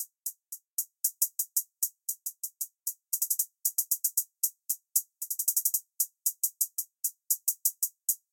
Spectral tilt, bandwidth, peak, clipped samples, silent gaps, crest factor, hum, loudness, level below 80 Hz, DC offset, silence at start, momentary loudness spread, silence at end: 10.5 dB/octave; 17 kHz; -8 dBFS; under 0.1%; 0.72-0.77 s; 26 dB; none; -30 LUFS; under -90 dBFS; under 0.1%; 0 s; 9 LU; 0.15 s